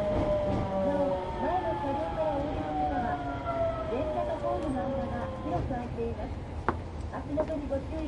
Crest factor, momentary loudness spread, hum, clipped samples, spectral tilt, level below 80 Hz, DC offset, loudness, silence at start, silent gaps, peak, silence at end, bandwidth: 22 dB; 6 LU; none; under 0.1%; -8 dB/octave; -42 dBFS; under 0.1%; -32 LUFS; 0 s; none; -8 dBFS; 0 s; 11 kHz